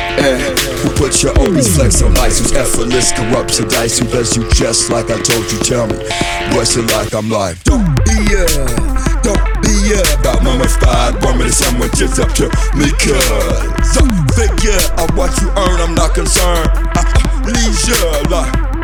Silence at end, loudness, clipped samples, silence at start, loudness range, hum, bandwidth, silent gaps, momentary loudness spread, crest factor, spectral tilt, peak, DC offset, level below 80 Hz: 0 s; -13 LUFS; under 0.1%; 0 s; 2 LU; none; 19.5 kHz; none; 4 LU; 12 dB; -4 dB/octave; 0 dBFS; under 0.1%; -14 dBFS